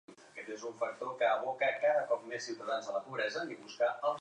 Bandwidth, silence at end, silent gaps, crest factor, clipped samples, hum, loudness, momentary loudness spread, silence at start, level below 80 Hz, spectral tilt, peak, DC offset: 10 kHz; 0 s; none; 16 dB; under 0.1%; none; -35 LUFS; 12 LU; 0.1 s; under -90 dBFS; -3 dB/octave; -18 dBFS; under 0.1%